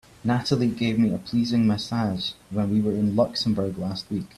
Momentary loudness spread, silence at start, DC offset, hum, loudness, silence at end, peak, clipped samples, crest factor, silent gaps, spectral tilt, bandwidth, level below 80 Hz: 7 LU; 0.25 s; under 0.1%; none; -24 LUFS; 0.1 s; -8 dBFS; under 0.1%; 16 dB; none; -6.5 dB/octave; 12.5 kHz; -54 dBFS